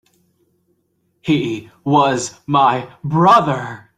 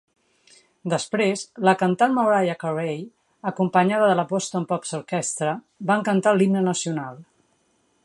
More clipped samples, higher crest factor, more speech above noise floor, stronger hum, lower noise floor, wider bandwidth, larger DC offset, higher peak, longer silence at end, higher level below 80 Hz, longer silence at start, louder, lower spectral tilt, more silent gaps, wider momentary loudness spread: neither; about the same, 16 dB vs 20 dB; first, 50 dB vs 44 dB; neither; about the same, -65 dBFS vs -66 dBFS; about the same, 12.5 kHz vs 11.5 kHz; neither; about the same, -2 dBFS vs -2 dBFS; second, 0.2 s vs 0.8 s; first, -56 dBFS vs -72 dBFS; first, 1.25 s vs 0.85 s; first, -16 LUFS vs -22 LUFS; about the same, -5.5 dB/octave vs -5 dB/octave; neither; about the same, 13 LU vs 12 LU